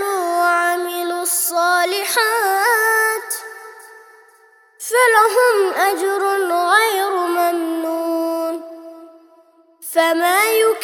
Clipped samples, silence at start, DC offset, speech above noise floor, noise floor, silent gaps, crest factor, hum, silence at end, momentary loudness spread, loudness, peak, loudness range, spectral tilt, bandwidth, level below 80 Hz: under 0.1%; 0 s; under 0.1%; 36 dB; -52 dBFS; none; 18 dB; none; 0 s; 12 LU; -16 LUFS; 0 dBFS; 4 LU; 1 dB/octave; over 20 kHz; -78 dBFS